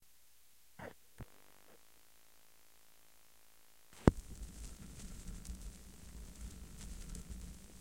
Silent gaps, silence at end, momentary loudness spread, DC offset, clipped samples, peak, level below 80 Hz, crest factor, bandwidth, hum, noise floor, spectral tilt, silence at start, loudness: none; 0 s; 23 LU; under 0.1%; under 0.1%; -6 dBFS; -50 dBFS; 38 dB; 16.5 kHz; none; -69 dBFS; -6.5 dB/octave; 0 s; -43 LUFS